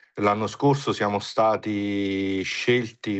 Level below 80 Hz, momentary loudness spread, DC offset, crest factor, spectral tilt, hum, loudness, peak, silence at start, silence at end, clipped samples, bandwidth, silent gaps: -64 dBFS; 3 LU; under 0.1%; 16 dB; -5.5 dB/octave; none; -24 LUFS; -8 dBFS; 0.15 s; 0 s; under 0.1%; 8.4 kHz; none